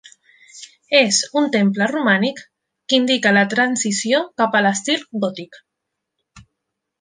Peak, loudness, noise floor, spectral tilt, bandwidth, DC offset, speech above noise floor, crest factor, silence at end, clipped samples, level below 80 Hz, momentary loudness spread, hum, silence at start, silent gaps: -2 dBFS; -17 LUFS; -79 dBFS; -3 dB/octave; 10 kHz; under 0.1%; 62 dB; 18 dB; 0.6 s; under 0.1%; -66 dBFS; 10 LU; none; 0.55 s; none